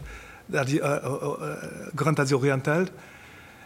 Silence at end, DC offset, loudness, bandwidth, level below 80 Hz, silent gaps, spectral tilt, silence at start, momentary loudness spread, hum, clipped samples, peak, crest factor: 0 s; under 0.1%; -27 LUFS; 16 kHz; -54 dBFS; none; -6 dB/octave; 0 s; 22 LU; none; under 0.1%; -8 dBFS; 20 dB